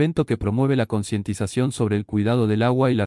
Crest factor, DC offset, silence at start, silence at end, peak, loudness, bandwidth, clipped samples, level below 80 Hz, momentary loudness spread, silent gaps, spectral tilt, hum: 14 dB; under 0.1%; 0 s; 0 s; -6 dBFS; -22 LUFS; 12 kHz; under 0.1%; -46 dBFS; 6 LU; none; -7 dB/octave; none